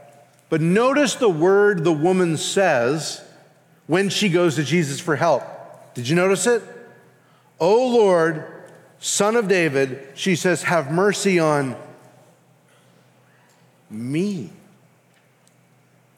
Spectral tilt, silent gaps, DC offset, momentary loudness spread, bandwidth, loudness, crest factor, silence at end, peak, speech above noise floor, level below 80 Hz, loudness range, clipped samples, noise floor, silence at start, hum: -4.5 dB/octave; none; under 0.1%; 15 LU; 16 kHz; -19 LUFS; 16 dB; 1.7 s; -6 dBFS; 39 dB; -74 dBFS; 13 LU; under 0.1%; -58 dBFS; 0.5 s; none